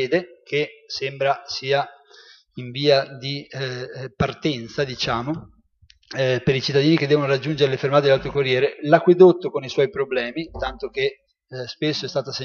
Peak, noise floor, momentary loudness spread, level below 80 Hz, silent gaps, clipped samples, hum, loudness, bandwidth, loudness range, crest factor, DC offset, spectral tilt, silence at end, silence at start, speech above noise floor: 0 dBFS; -57 dBFS; 12 LU; -50 dBFS; none; under 0.1%; none; -21 LUFS; 7 kHz; 7 LU; 20 dB; under 0.1%; -6 dB/octave; 0 s; 0 s; 36 dB